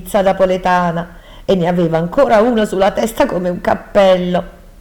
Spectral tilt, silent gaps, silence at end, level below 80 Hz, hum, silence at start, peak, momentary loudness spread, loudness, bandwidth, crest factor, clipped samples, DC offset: -6 dB/octave; none; 0.3 s; -36 dBFS; none; 0 s; 0 dBFS; 8 LU; -14 LUFS; 19.5 kHz; 14 dB; under 0.1%; under 0.1%